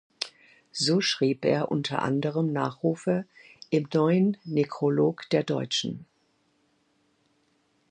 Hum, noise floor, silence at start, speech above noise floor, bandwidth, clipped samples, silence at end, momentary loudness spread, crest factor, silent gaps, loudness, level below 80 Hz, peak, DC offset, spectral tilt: none; -69 dBFS; 0.2 s; 44 dB; 10 kHz; under 0.1%; 1.9 s; 12 LU; 20 dB; none; -27 LUFS; -72 dBFS; -6 dBFS; under 0.1%; -5.5 dB/octave